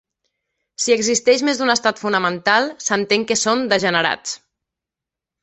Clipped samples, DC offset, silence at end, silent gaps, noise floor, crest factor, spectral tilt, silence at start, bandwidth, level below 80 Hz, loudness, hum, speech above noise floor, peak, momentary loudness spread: under 0.1%; under 0.1%; 1.05 s; none; -86 dBFS; 18 dB; -2 dB/octave; 0.8 s; 8.4 kHz; -62 dBFS; -17 LUFS; none; 69 dB; -2 dBFS; 6 LU